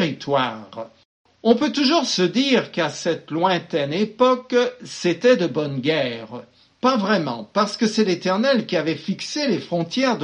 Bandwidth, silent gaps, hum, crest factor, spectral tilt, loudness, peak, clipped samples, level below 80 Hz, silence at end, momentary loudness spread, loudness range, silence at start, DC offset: 10 kHz; 1.05-1.25 s; none; 18 dB; -4.5 dB/octave; -21 LUFS; -4 dBFS; under 0.1%; -68 dBFS; 0 s; 8 LU; 2 LU; 0 s; under 0.1%